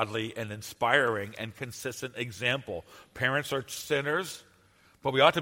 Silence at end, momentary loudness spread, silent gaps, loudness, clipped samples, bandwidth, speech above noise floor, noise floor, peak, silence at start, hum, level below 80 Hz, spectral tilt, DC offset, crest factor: 0 s; 14 LU; none; -30 LUFS; under 0.1%; 16.5 kHz; 32 dB; -62 dBFS; -6 dBFS; 0 s; none; -66 dBFS; -4 dB/octave; under 0.1%; 26 dB